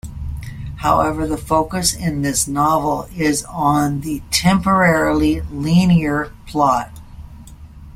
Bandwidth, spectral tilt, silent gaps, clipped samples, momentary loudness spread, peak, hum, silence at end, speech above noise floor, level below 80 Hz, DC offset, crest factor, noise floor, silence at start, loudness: 16 kHz; -5 dB/octave; none; under 0.1%; 11 LU; -2 dBFS; none; 0 s; 21 dB; -34 dBFS; under 0.1%; 16 dB; -37 dBFS; 0.05 s; -17 LUFS